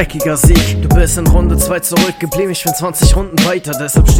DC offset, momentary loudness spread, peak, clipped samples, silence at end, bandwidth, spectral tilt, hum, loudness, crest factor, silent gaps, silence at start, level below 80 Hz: under 0.1%; 6 LU; 0 dBFS; 0.3%; 0 s; 17.5 kHz; -5 dB/octave; none; -12 LUFS; 10 dB; none; 0 s; -14 dBFS